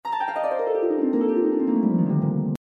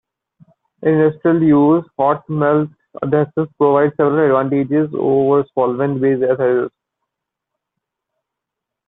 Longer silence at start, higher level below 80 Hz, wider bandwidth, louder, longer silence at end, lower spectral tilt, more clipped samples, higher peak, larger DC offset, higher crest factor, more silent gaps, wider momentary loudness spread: second, 0.05 s vs 0.8 s; second, -66 dBFS vs -60 dBFS; first, 6 kHz vs 3.9 kHz; second, -23 LUFS vs -16 LUFS; second, 0.15 s vs 2.2 s; second, -10 dB/octave vs -12 dB/octave; neither; second, -10 dBFS vs -2 dBFS; neither; about the same, 12 dB vs 14 dB; neither; about the same, 4 LU vs 6 LU